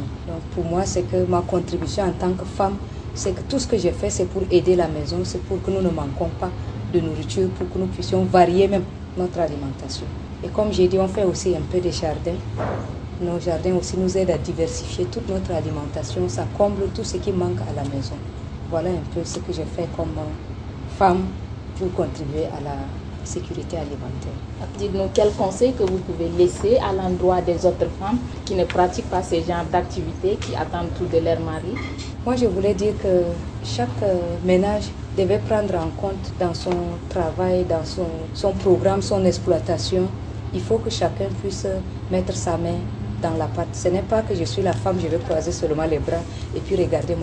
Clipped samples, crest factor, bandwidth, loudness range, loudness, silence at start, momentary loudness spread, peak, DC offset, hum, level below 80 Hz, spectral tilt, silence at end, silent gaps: under 0.1%; 20 dB; 9.8 kHz; 4 LU; -23 LUFS; 0 s; 10 LU; -2 dBFS; under 0.1%; none; -36 dBFS; -6.5 dB/octave; 0 s; none